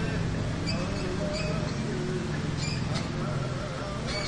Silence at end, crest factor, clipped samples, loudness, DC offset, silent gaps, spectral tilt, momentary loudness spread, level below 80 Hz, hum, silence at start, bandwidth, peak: 0 s; 12 dB; under 0.1%; -31 LUFS; under 0.1%; none; -5.5 dB/octave; 2 LU; -42 dBFS; none; 0 s; 11 kHz; -18 dBFS